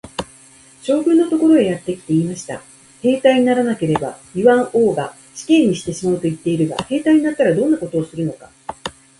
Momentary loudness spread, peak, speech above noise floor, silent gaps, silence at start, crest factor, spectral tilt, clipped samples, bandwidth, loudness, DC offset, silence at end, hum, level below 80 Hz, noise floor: 16 LU; 0 dBFS; 30 dB; none; 0.05 s; 16 dB; -6 dB/octave; under 0.1%; 11.5 kHz; -17 LUFS; under 0.1%; 0.3 s; none; -54 dBFS; -46 dBFS